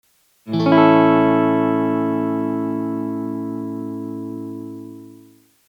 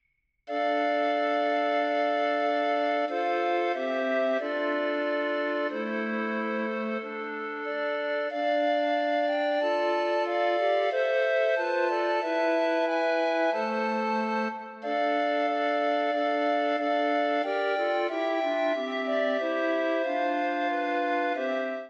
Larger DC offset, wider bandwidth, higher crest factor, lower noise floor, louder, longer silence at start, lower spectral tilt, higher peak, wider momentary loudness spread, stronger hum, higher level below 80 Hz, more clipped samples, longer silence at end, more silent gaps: neither; second, 6 kHz vs 7.8 kHz; first, 18 dB vs 12 dB; about the same, -50 dBFS vs -51 dBFS; first, -18 LUFS vs -27 LUFS; about the same, 0.45 s vs 0.45 s; first, -8.5 dB/octave vs -4.5 dB/octave; first, -2 dBFS vs -14 dBFS; first, 18 LU vs 4 LU; neither; first, -80 dBFS vs -90 dBFS; neither; first, 0.55 s vs 0 s; neither